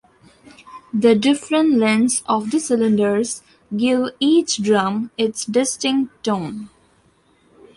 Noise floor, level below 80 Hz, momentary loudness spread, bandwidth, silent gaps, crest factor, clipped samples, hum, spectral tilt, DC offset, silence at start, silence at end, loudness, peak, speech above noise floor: -57 dBFS; -62 dBFS; 9 LU; 11.5 kHz; none; 16 dB; under 0.1%; none; -4 dB/octave; under 0.1%; 0.65 s; 1.1 s; -18 LUFS; -2 dBFS; 40 dB